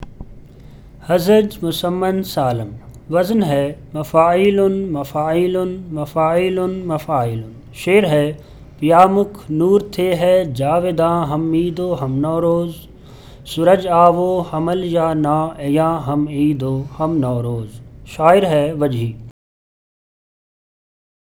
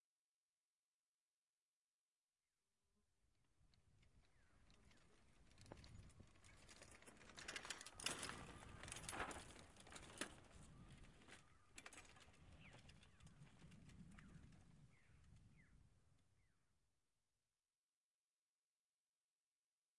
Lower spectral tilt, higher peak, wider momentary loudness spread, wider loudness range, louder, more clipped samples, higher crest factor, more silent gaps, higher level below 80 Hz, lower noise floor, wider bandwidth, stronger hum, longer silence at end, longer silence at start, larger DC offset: first, -7 dB/octave vs -2.5 dB/octave; first, 0 dBFS vs -28 dBFS; second, 12 LU vs 17 LU; second, 3 LU vs 15 LU; first, -17 LUFS vs -57 LUFS; neither; second, 18 dB vs 34 dB; second, none vs 0.00-2.28 s, 17.75-19.36 s; first, -44 dBFS vs -74 dBFS; second, -39 dBFS vs under -90 dBFS; first, 19.5 kHz vs 12 kHz; neither; first, 2 s vs 0 s; about the same, 0 s vs 0 s; neither